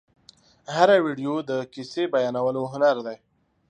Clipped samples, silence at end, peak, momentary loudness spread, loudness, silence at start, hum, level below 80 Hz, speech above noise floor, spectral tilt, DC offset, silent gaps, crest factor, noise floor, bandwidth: under 0.1%; 0.55 s; -4 dBFS; 14 LU; -23 LUFS; 0.7 s; none; -72 dBFS; 33 dB; -5.5 dB/octave; under 0.1%; none; 20 dB; -56 dBFS; 9.2 kHz